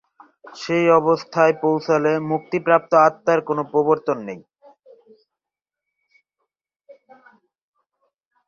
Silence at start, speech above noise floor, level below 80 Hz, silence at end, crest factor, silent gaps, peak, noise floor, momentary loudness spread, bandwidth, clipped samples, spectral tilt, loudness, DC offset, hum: 0.45 s; 69 dB; -68 dBFS; 4.1 s; 20 dB; none; -2 dBFS; -88 dBFS; 10 LU; 7.2 kHz; under 0.1%; -6.5 dB/octave; -19 LUFS; under 0.1%; none